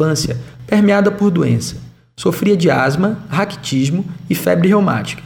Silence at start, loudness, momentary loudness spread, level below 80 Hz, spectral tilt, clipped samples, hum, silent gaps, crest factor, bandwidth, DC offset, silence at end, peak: 0 s; -15 LUFS; 9 LU; -46 dBFS; -6 dB/octave; under 0.1%; none; none; 14 dB; over 20 kHz; under 0.1%; 0 s; -2 dBFS